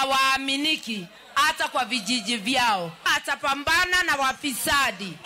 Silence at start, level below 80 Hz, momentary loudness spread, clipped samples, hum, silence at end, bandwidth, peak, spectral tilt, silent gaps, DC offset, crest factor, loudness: 0 s; -54 dBFS; 6 LU; under 0.1%; none; 0 s; 16 kHz; -10 dBFS; -1.5 dB/octave; none; under 0.1%; 14 dB; -23 LUFS